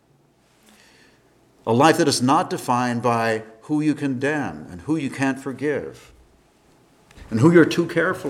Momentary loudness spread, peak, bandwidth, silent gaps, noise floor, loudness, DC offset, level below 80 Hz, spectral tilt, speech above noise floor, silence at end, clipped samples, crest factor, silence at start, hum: 13 LU; -2 dBFS; 15 kHz; none; -59 dBFS; -20 LUFS; under 0.1%; -58 dBFS; -5.5 dB/octave; 39 dB; 0 s; under 0.1%; 20 dB; 1.65 s; none